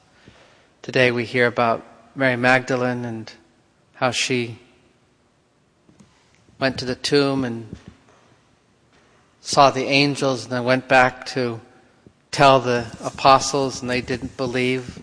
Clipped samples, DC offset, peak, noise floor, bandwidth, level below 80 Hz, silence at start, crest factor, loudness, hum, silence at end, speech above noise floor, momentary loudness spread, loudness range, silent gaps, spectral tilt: under 0.1%; under 0.1%; 0 dBFS; -61 dBFS; 10.5 kHz; -54 dBFS; 0.85 s; 22 dB; -20 LUFS; none; 0 s; 42 dB; 15 LU; 8 LU; none; -4.5 dB/octave